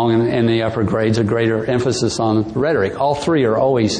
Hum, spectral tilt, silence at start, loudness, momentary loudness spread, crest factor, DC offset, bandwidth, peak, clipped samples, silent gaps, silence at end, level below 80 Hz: none; -6 dB/octave; 0 s; -17 LUFS; 3 LU; 12 dB; under 0.1%; 10 kHz; -6 dBFS; under 0.1%; none; 0 s; -44 dBFS